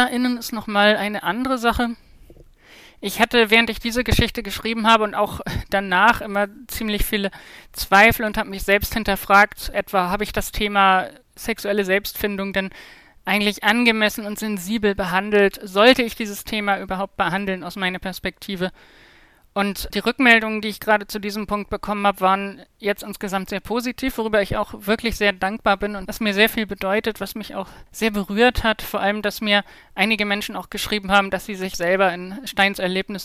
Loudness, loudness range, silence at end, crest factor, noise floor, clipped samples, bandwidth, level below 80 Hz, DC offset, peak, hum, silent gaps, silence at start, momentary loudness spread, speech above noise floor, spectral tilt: -20 LUFS; 5 LU; 0 s; 20 dB; -52 dBFS; under 0.1%; 16 kHz; -38 dBFS; under 0.1%; -2 dBFS; none; none; 0 s; 12 LU; 31 dB; -4 dB/octave